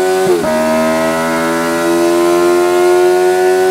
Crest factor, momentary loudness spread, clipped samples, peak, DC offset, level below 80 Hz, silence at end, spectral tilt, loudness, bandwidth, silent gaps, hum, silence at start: 10 dB; 4 LU; under 0.1%; 0 dBFS; under 0.1%; -50 dBFS; 0 s; -4.5 dB/octave; -11 LUFS; 16 kHz; none; none; 0 s